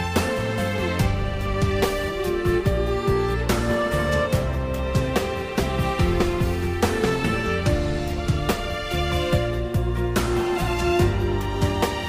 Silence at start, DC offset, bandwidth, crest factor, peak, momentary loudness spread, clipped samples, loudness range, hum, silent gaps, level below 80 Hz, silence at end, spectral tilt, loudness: 0 s; under 0.1%; 16 kHz; 14 dB; -8 dBFS; 3 LU; under 0.1%; 1 LU; none; none; -30 dBFS; 0 s; -6 dB/octave; -23 LUFS